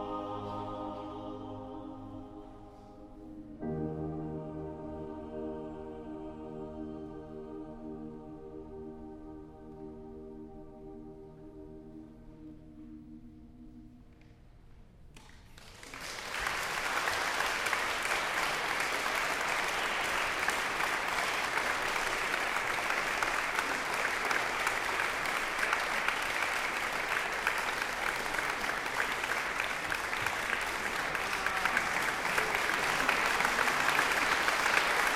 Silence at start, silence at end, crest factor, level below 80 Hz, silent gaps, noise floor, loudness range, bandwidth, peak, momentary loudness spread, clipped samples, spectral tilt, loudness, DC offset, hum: 0 s; 0 s; 24 dB; -56 dBFS; none; -56 dBFS; 19 LU; 16 kHz; -10 dBFS; 21 LU; under 0.1%; -2 dB/octave; -32 LUFS; under 0.1%; none